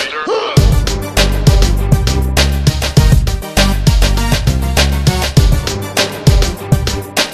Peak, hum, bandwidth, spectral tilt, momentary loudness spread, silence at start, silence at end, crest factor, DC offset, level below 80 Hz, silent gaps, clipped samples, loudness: 0 dBFS; none; 14.5 kHz; -4.5 dB/octave; 4 LU; 0 s; 0 s; 12 dB; under 0.1%; -14 dBFS; none; 0.3%; -13 LUFS